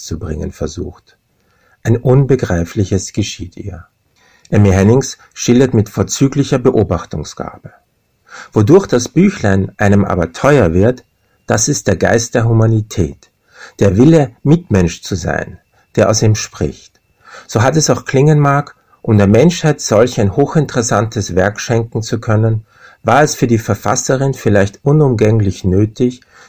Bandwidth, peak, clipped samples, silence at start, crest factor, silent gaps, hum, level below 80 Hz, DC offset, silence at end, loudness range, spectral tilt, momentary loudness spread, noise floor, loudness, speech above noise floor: 16 kHz; 0 dBFS; 0.5%; 0 s; 14 dB; none; none; -32 dBFS; under 0.1%; 0.3 s; 4 LU; -6 dB/octave; 12 LU; -56 dBFS; -13 LUFS; 44 dB